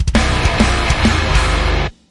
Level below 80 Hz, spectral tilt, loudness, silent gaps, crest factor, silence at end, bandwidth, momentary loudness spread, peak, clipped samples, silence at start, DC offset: -18 dBFS; -4.5 dB/octave; -15 LUFS; none; 14 dB; 0.2 s; 11.5 kHz; 3 LU; 0 dBFS; under 0.1%; 0 s; under 0.1%